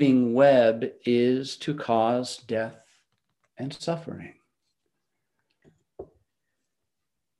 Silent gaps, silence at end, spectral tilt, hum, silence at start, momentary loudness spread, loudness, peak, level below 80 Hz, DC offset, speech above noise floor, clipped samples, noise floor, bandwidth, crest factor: none; 1.35 s; -6 dB/octave; none; 0 s; 18 LU; -24 LUFS; -8 dBFS; -72 dBFS; under 0.1%; 62 dB; under 0.1%; -85 dBFS; 11.5 kHz; 20 dB